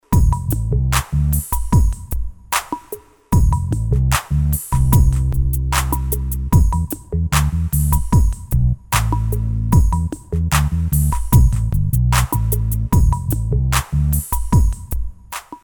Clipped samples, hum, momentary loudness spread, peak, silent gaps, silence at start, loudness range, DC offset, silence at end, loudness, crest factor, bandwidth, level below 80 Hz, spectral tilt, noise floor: under 0.1%; none; 7 LU; 0 dBFS; none; 0.1 s; 2 LU; under 0.1%; 0.05 s; -18 LUFS; 16 dB; over 20 kHz; -20 dBFS; -5.5 dB/octave; -36 dBFS